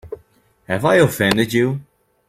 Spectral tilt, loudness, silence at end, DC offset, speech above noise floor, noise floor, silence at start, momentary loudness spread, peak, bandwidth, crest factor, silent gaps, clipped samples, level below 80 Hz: -5.5 dB/octave; -17 LUFS; 0.45 s; under 0.1%; 38 dB; -54 dBFS; 0.05 s; 19 LU; -2 dBFS; 16.5 kHz; 18 dB; none; under 0.1%; -50 dBFS